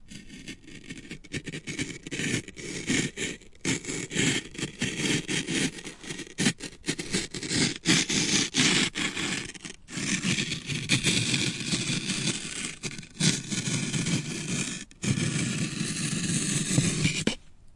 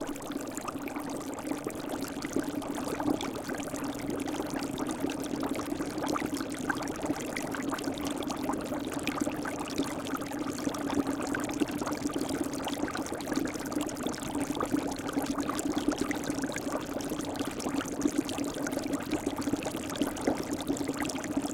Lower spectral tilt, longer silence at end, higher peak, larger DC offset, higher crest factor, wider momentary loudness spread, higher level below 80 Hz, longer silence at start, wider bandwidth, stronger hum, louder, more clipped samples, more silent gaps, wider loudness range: about the same, -3 dB/octave vs -4 dB/octave; about the same, 0 s vs 0 s; first, -8 dBFS vs -12 dBFS; neither; about the same, 22 dB vs 22 dB; first, 14 LU vs 4 LU; about the same, -54 dBFS vs -56 dBFS; about the same, 0 s vs 0 s; second, 11.5 kHz vs 17 kHz; neither; first, -28 LUFS vs -33 LUFS; neither; neither; first, 5 LU vs 2 LU